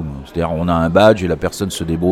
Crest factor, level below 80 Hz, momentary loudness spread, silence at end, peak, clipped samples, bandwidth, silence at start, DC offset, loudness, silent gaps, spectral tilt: 16 dB; -34 dBFS; 11 LU; 0 s; 0 dBFS; under 0.1%; 16 kHz; 0 s; under 0.1%; -16 LUFS; none; -6 dB/octave